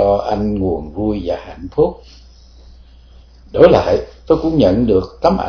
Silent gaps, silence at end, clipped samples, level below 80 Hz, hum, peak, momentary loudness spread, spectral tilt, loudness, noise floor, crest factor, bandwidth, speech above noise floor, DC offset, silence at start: none; 0 s; 0.3%; -34 dBFS; none; 0 dBFS; 12 LU; -8 dB/octave; -15 LUFS; -42 dBFS; 16 dB; 5.4 kHz; 27 dB; under 0.1%; 0 s